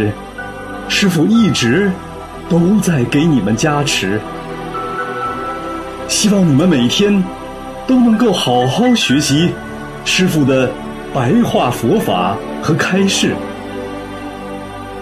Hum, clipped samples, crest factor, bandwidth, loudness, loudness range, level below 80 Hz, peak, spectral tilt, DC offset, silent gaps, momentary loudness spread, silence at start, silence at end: none; under 0.1%; 14 dB; 13.5 kHz; -14 LUFS; 3 LU; -40 dBFS; -2 dBFS; -5 dB/octave; under 0.1%; none; 15 LU; 0 s; 0 s